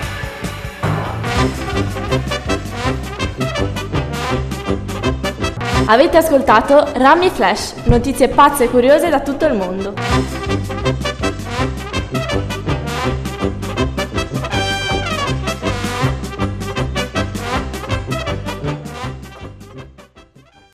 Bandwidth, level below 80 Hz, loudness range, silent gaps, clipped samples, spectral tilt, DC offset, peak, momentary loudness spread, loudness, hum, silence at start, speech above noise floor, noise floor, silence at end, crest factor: 14 kHz; -28 dBFS; 9 LU; none; under 0.1%; -5.5 dB/octave; under 0.1%; 0 dBFS; 12 LU; -17 LUFS; none; 0 s; 34 dB; -47 dBFS; 0.55 s; 16 dB